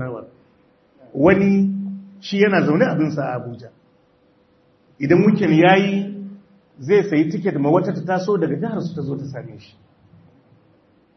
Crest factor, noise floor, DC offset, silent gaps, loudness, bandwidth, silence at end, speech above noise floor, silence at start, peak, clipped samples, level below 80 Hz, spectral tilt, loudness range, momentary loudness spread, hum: 20 dB; -58 dBFS; under 0.1%; none; -18 LUFS; 6.4 kHz; 1.55 s; 40 dB; 0 s; 0 dBFS; under 0.1%; -60 dBFS; -8 dB/octave; 5 LU; 20 LU; none